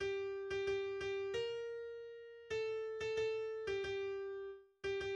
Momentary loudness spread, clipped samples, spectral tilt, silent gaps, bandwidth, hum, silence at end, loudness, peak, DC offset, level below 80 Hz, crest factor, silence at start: 10 LU; under 0.1%; -4.5 dB/octave; none; 8.6 kHz; none; 0 s; -42 LUFS; -30 dBFS; under 0.1%; -68 dBFS; 12 dB; 0 s